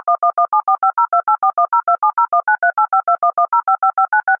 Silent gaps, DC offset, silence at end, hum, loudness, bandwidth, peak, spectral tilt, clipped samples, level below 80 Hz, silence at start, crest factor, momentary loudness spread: none; under 0.1%; 0.05 s; none; -15 LUFS; 2.5 kHz; -4 dBFS; -6 dB/octave; under 0.1%; -72 dBFS; 0.05 s; 10 dB; 1 LU